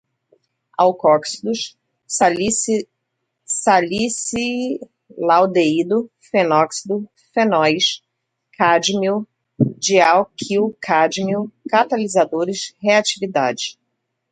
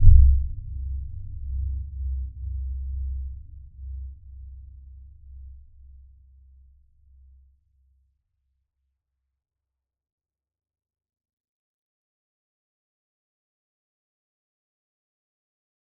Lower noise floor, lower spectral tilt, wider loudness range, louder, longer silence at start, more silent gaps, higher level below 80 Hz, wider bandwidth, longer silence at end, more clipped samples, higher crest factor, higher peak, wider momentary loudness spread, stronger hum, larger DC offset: second, -75 dBFS vs -87 dBFS; second, -3.5 dB/octave vs -20.5 dB/octave; second, 2 LU vs 21 LU; first, -18 LUFS vs -28 LUFS; first, 0.8 s vs 0 s; neither; second, -60 dBFS vs -28 dBFS; first, 10.5 kHz vs 0.3 kHz; second, 0.6 s vs 10.45 s; neither; second, 18 dB vs 26 dB; about the same, 0 dBFS vs -2 dBFS; second, 10 LU vs 22 LU; neither; neither